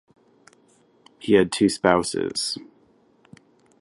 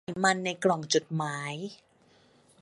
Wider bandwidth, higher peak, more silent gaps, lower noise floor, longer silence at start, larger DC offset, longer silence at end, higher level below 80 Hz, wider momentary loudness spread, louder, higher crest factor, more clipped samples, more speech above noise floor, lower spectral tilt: about the same, 11.5 kHz vs 11.5 kHz; first, -2 dBFS vs -10 dBFS; neither; about the same, -59 dBFS vs -62 dBFS; first, 1.2 s vs 0.1 s; neither; first, 1.15 s vs 0.85 s; first, -56 dBFS vs -74 dBFS; about the same, 12 LU vs 12 LU; first, -22 LUFS vs -29 LUFS; about the same, 24 dB vs 20 dB; neither; first, 38 dB vs 33 dB; about the same, -4 dB/octave vs -4 dB/octave